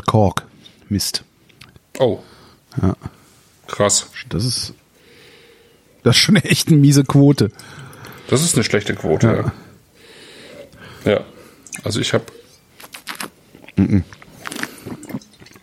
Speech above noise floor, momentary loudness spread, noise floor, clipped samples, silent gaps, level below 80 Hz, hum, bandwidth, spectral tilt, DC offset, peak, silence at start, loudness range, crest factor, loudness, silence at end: 35 dB; 25 LU; -51 dBFS; under 0.1%; none; -48 dBFS; none; 15.5 kHz; -5 dB/octave; under 0.1%; 0 dBFS; 0.05 s; 9 LU; 18 dB; -17 LUFS; 0.45 s